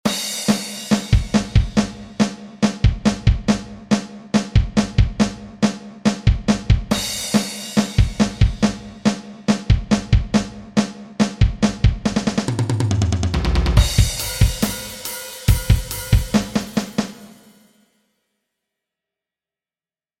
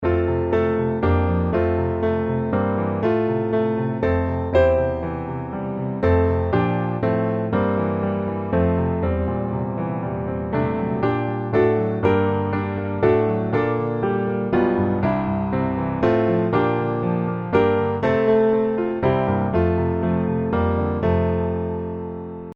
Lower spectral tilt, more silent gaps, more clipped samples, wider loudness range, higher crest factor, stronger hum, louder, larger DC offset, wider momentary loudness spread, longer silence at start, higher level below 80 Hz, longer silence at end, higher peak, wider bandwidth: second, -5.5 dB/octave vs -10.5 dB/octave; neither; neither; about the same, 3 LU vs 2 LU; about the same, 18 dB vs 16 dB; neither; about the same, -20 LUFS vs -21 LUFS; neither; about the same, 5 LU vs 7 LU; about the same, 0.05 s vs 0 s; first, -24 dBFS vs -38 dBFS; first, 2.95 s vs 0 s; first, 0 dBFS vs -4 dBFS; first, 17 kHz vs 5.4 kHz